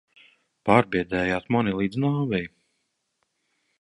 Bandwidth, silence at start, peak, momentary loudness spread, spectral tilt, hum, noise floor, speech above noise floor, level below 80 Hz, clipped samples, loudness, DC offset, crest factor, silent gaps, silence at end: 11 kHz; 0.65 s; -2 dBFS; 9 LU; -7.5 dB/octave; none; -76 dBFS; 53 dB; -54 dBFS; under 0.1%; -24 LUFS; under 0.1%; 24 dB; none; 1.35 s